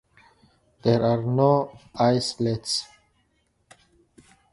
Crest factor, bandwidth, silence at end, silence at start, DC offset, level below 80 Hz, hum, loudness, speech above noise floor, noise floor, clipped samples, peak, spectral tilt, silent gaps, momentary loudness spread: 20 dB; 11.5 kHz; 1.7 s; 0.85 s; under 0.1%; -58 dBFS; none; -23 LUFS; 46 dB; -69 dBFS; under 0.1%; -6 dBFS; -6 dB/octave; none; 8 LU